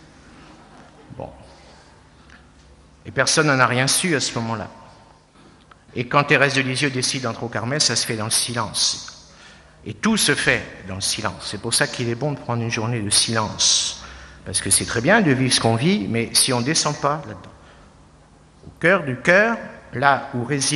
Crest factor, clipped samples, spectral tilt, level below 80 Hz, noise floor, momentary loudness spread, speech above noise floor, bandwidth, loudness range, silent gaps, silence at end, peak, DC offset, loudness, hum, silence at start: 22 dB; under 0.1%; -3 dB/octave; -52 dBFS; -50 dBFS; 15 LU; 30 dB; 12 kHz; 4 LU; none; 0 s; 0 dBFS; under 0.1%; -19 LUFS; none; 0.5 s